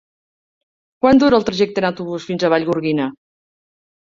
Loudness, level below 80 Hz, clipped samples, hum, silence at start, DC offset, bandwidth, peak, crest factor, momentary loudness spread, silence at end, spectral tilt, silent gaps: -17 LUFS; -52 dBFS; under 0.1%; none; 1.05 s; under 0.1%; 7.6 kHz; -2 dBFS; 18 dB; 11 LU; 1.05 s; -6 dB/octave; none